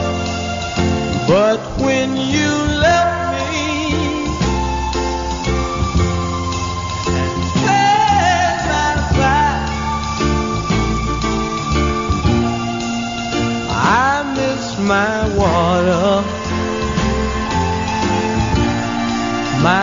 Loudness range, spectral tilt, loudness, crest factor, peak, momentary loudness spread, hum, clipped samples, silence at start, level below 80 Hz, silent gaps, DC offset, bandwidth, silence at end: 3 LU; -4.5 dB/octave; -17 LUFS; 14 dB; -2 dBFS; 7 LU; none; under 0.1%; 0 s; -28 dBFS; none; under 0.1%; 7.6 kHz; 0 s